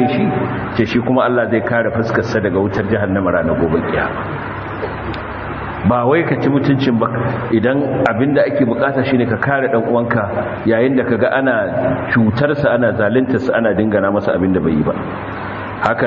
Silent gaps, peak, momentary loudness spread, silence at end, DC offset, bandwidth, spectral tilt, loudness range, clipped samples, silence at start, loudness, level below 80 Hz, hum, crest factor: none; 0 dBFS; 9 LU; 0 s; 0.1%; 7 kHz; -8.5 dB/octave; 3 LU; under 0.1%; 0 s; -16 LUFS; -42 dBFS; none; 16 dB